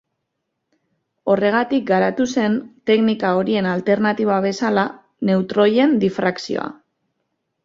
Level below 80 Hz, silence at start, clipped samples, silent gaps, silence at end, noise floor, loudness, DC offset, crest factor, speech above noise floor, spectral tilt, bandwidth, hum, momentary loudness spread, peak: -62 dBFS; 1.25 s; under 0.1%; none; 0.9 s; -76 dBFS; -19 LUFS; under 0.1%; 16 dB; 59 dB; -6 dB/octave; 7.6 kHz; none; 9 LU; -4 dBFS